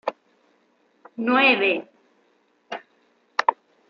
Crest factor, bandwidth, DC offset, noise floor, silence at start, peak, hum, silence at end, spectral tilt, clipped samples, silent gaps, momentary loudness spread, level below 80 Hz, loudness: 24 dB; 7.2 kHz; under 0.1%; -64 dBFS; 0.05 s; -2 dBFS; none; 0.35 s; -4 dB/octave; under 0.1%; none; 21 LU; -82 dBFS; -21 LUFS